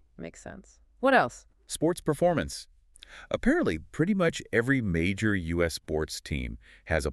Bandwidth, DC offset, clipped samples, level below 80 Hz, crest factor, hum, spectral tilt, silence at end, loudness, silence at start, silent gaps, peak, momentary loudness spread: 13.5 kHz; under 0.1%; under 0.1%; -44 dBFS; 22 dB; none; -5.5 dB/octave; 0 s; -28 LUFS; 0.2 s; none; -8 dBFS; 17 LU